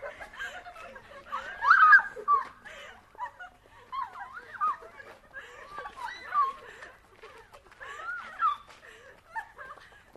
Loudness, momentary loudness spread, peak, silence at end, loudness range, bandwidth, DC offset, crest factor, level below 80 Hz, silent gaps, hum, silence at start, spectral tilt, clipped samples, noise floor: -26 LUFS; 26 LU; -8 dBFS; 0.45 s; 13 LU; 12.5 kHz; under 0.1%; 24 dB; -66 dBFS; none; none; 0 s; -1.5 dB/octave; under 0.1%; -53 dBFS